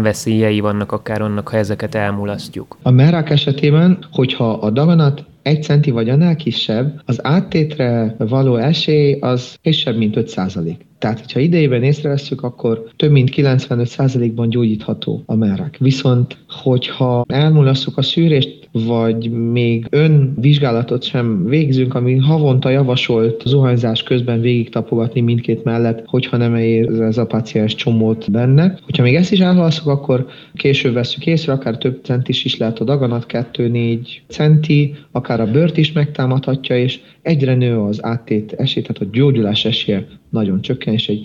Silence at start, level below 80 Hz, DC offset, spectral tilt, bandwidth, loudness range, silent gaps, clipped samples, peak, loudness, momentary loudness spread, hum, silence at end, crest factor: 0 s; -52 dBFS; under 0.1%; -7.5 dB/octave; 10.5 kHz; 3 LU; none; under 0.1%; -2 dBFS; -15 LUFS; 8 LU; none; 0 s; 14 dB